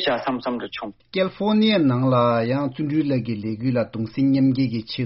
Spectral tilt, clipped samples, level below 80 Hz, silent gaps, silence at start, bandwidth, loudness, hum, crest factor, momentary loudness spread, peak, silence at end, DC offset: -5.5 dB/octave; under 0.1%; -56 dBFS; none; 0 s; 5.8 kHz; -21 LUFS; none; 14 dB; 10 LU; -8 dBFS; 0 s; under 0.1%